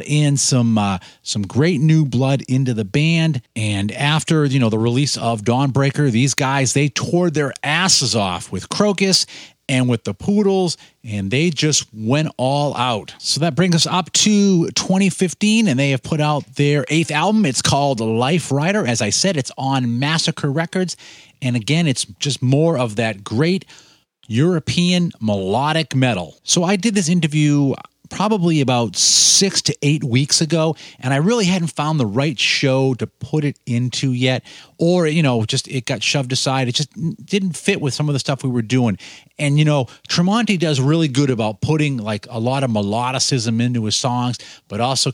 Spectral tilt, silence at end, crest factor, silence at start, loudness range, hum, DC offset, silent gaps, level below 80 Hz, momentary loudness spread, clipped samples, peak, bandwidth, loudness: -4.5 dB/octave; 0 s; 16 dB; 0 s; 4 LU; none; under 0.1%; none; -56 dBFS; 7 LU; under 0.1%; -2 dBFS; 16.5 kHz; -17 LUFS